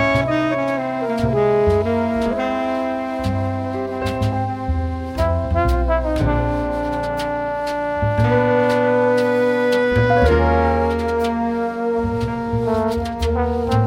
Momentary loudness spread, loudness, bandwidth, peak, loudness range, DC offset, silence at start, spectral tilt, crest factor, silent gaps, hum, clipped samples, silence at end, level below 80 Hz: 7 LU; -19 LUFS; 16 kHz; -4 dBFS; 5 LU; under 0.1%; 0 s; -7.5 dB/octave; 14 dB; none; none; under 0.1%; 0 s; -28 dBFS